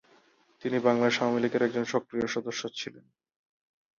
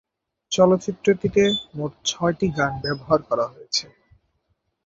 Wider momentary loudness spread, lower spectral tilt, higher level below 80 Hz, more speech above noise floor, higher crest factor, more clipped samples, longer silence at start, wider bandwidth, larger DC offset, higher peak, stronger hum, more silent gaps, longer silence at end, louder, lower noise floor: first, 12 LU vs 8 LU; about the same, -4.5 dB/octave vs -4.5 dB/octave; second, -72 dBFS vs -52 dBFS; second, 35 dB vs 50 dB; about the same, 20 dB vs 20 dB; neither; first, 0.65 s vs 0.5 s; about the same, 7.4 kHz vs 7.8 kHz; neither; second, -10 dBFS vs -2 dBFS; neither; neither; about the same, 1 s vs 1.05 s; second, -29 LUFS vs -22 LUFS; second, -63 dBFS vs -72 dBFS